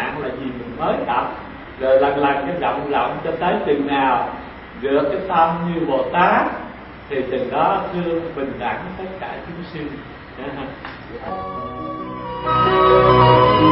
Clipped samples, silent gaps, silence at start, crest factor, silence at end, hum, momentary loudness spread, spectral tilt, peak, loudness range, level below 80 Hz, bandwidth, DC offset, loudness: under 0.1%; none; 0 s; 18 dB; 0 s; none; 18 LU; -11 dB/octave; 0 dBFS; 10 LU; -42 dBFS; 5.8 kHz; under 0.1%; -19 LUFS